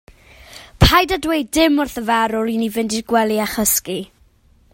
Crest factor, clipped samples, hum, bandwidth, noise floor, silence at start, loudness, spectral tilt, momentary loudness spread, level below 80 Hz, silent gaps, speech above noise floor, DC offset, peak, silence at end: 18 dB; under 0.1%; none; 16.5 kHz; -53 dBFS; 0.5 s; -17 LUFS; -4 dB/octave; 8 LU; -32 dBFS; none; 36 dB; under 0.1%; 0 dBFS; 0.7 s